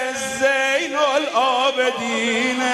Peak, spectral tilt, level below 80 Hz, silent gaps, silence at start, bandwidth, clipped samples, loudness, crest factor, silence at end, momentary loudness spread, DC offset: -4 dBFS; -1.5 dB/octave; -64 dBFS; none; 0 s; 13 kHz; under 0.1%; -19 LUFS; 14 dB; 0 s; 3 LU; under 0.1%